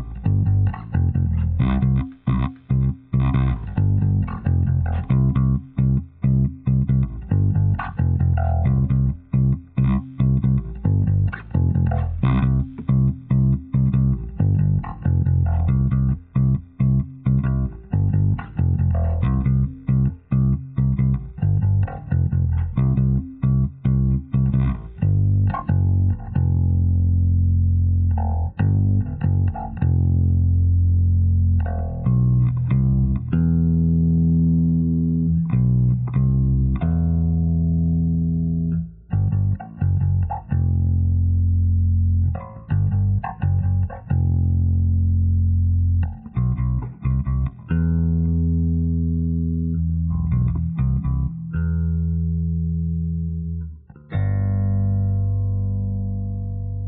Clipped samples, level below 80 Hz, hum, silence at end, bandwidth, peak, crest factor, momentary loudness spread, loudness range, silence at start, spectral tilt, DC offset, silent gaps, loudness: under 0.1%; -28 dBFS; 60 Hz at -50 dBFS; 0 s; 3.8 kHz; -6 dBFS; 12 dB; 5 LU; 3 LU; 0 s; -11 dB/octave; under 0.1%; none; -21 LUFS